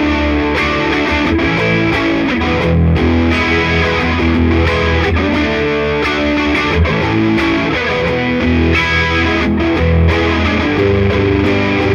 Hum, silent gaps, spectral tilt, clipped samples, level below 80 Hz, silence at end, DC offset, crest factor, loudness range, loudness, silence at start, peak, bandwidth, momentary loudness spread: none; none; -6.5 dB/octave; under 0.1%; -24 dBFS; 0 s; under 0.1%; 12 dB; 1 LU; -13 LUFS; 0 s; 0 dBFS; 7.4 kHz; 2 LU